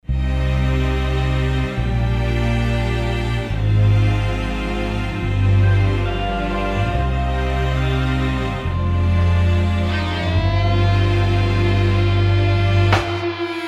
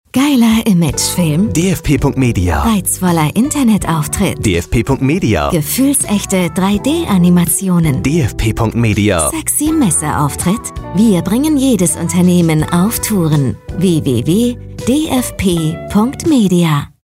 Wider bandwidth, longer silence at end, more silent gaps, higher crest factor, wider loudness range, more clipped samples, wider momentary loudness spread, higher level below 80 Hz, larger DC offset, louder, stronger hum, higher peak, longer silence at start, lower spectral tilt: second, 8.6 kHz vs 16.5 kHz; second, 0 s vs 0.15 s; neither; about the same, 14 dB vs 10 dB; about the same, 3 LU vs 1 LU; neither; about the same, 6 LU vs 5 LU; first, -24 dBFS vs -30 dBFS; neither; second, -19 LUFS vs -13 LUFS; neither; about the same, -2 dBFS vs -2 dBFS; about the same, 0.1 s vs 0.15 s; first, -7 dB/octave vs -5.5 dB/octave